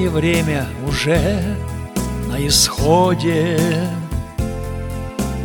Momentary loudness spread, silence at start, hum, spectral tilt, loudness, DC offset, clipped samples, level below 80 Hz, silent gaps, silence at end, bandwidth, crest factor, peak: 12 LU; 0 s; none; -4.5 dB/octave; -18 LUFS; under 0.1%; under 0.1%; -30 dBFS; none; 0 s; 19 kHz; 18 dB; 0 dBFS